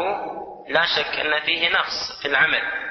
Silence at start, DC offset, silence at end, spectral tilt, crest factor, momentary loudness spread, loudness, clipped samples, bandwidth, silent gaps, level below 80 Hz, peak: 0 s; under 0.1%; 0 s; -2 dB/octave; 18 dB; 9 LU; -20 LUFS; under 0.1%; 6.4 kHz; none; -58 dBFS; -4 dBFS